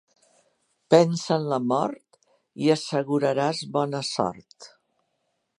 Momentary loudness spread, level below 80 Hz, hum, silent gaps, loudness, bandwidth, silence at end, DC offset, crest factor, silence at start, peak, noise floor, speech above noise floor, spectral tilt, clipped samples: 10 LU; -70 dBFS; none; none; -24 LUFS; 11 kHz; 0.9 s; under 0.1%; 24 dB; 0.9 s; -2 dBFS; -75 dBFS; 52 dB; -5.5 dB/octave; under 0.1%